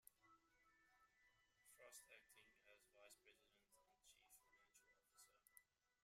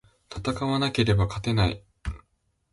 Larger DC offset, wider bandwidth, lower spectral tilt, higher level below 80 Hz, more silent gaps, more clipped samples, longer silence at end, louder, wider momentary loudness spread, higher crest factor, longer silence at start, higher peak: neither; first, 15.5 kHz vs 11.5 kHz; second, 0 dB/octave vs -6.5 dB/octave; second, under -90 dBFS vs -40 dBFS; neither; neither; second, 0 s vs 0.55 s; second, -67 LUFS vs -25 LUFS; second, 5 LU vs 15 LU; first, 28 dB vs 16 dB; second, 0 s vs 0.3 s; second, -46 dBFS vs -10 dBFS